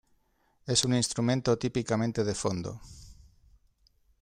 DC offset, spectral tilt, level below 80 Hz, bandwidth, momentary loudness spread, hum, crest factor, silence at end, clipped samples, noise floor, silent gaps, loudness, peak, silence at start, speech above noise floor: under 0.1%; -4.5 dB/octave; -56 dBFS; 14.5 kHz; 13 LU; none; 20 dB; 1.1 s; under 0.1%; -70 dBFS; none; -29 LUFS; -12 dBFS; 0.65 s; 41 dB